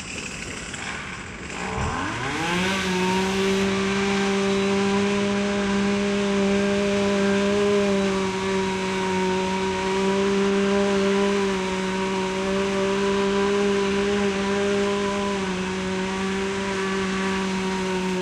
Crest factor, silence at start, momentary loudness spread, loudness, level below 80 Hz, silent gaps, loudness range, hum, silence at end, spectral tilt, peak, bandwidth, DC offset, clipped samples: 14 dB; 0 s; 5 LU; -23 LUFS; -46 dBFS; none; 3 LU; none; 0 s; -5 dB/octave; -10 dBFS; 11 kHz; under 0.1%; under 0.1%